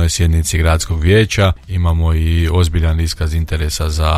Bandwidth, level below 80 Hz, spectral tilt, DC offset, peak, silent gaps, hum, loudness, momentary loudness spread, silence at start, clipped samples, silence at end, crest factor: 14.5 kHz; -22 dBFS; -5 dB/octave; under 0.1%; 0 dBFS; none; none; -15 LUFS; 6 LU; 0 s; under 0.1%; 0 s; 12 dB